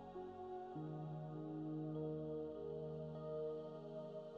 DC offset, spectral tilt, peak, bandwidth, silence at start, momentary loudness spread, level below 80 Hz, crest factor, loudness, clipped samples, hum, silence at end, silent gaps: under 0.1%; -9 dB/octave; -34 dBFS; 5.8 kHz; 0 s; 5 LU; -78 dBFS; 12 dB; -48 LUFS; under 0.1%; none; 0 s; none